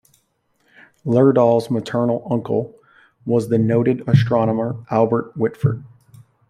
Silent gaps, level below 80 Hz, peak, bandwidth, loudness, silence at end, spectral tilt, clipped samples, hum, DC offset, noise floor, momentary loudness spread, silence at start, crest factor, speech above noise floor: none; -56 dBFS; -2 dBFS; 12 kHz; -18 LUFS; 0.65 s; -9 dB/octave; under 0.1%; none; under 0.1%; -65 dBFS; 9 LU; 1.05 s; 16 dB; 48 dB